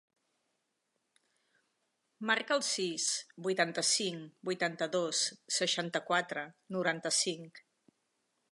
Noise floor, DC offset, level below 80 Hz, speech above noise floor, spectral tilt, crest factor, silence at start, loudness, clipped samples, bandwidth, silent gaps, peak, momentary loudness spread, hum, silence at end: -82 dBFS; under 0.1%; -90 dBFS; 48 dB; -2 dB/octave; 22 dB; 2.2 s; -33 LUFS; under 0.1%; 11.5 kHz; none; -14 dBFS; 10 LU; none; 0.95 s